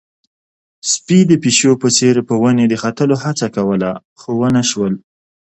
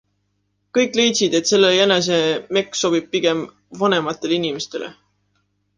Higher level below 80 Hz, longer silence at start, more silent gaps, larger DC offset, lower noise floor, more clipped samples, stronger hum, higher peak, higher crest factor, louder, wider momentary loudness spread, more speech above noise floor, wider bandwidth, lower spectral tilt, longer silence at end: first, -54 dBFS vs -64 dBFS; about the same, 0.85 s vs 0.75 s; first, 4.05-4.16 s vs none; neither; first, under -90 dBFS vs -69 dBFS; neither; second, none vs 50 Hz at -45 dBFS; about the same, 0 dBFS vs -2 dBFS; about the same, 14 dB vs 18 dB; first, -14 LUFS vs -18 LUFS; about the same, 10 LU vs 12 LU; first, over 76 dB vs 51 dB; second, 9 kHz vs 10 kHz; first, -4.5 dB/octave vs -3 dB/octave; second, 0.45 s vs 0.85 s